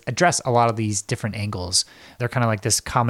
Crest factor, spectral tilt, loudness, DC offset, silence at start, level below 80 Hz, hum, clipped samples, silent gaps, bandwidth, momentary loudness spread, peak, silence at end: 18 dB; -3.5 dB/octave; -22 LUFS; under 0.1%; 0.05 s; -50 dBFS; none; under 0.1%; none; 15.5 kHz; 8 LU; -4 dBFS; 0 s